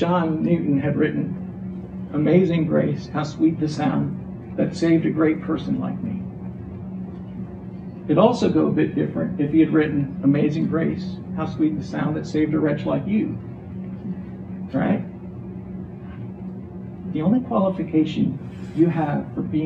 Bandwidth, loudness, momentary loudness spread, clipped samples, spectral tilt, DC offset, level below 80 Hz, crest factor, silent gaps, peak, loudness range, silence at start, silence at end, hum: 8.4 kHz; -22 LUFS; 16 LU; under 0.1%; -8.5 dB/octave; under 0.1%; -50 dBFS; 20 dB; none; -2 dBFS; 6 LU; 0 s; 0 s; none